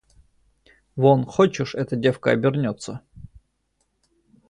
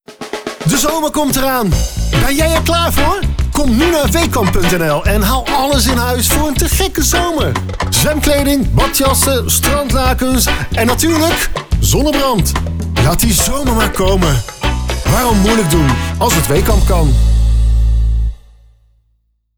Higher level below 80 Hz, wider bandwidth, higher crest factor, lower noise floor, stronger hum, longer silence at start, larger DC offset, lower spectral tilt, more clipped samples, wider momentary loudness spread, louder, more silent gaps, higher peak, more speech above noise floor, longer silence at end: second, -56 dBFS vs -18 dBFS; second, 10.5 kHz vs over 20 kHz; first, 20 dB vs 10 dB; first, -71 dBFS vs -60 dBFS; neither; first, 0.95 s vs 0.1 s; neither; first, -7 dB/octave vs -4.5 dB/octave; neither; first, 17 LU vs 5 LU; second, -21 LUFS vs -13 LUFS; neither; about the same, -2 dBFS vs -2 dBFS; about the same, 51 dB vs 48 dB; about the same, 1.25 s vs 1.2 s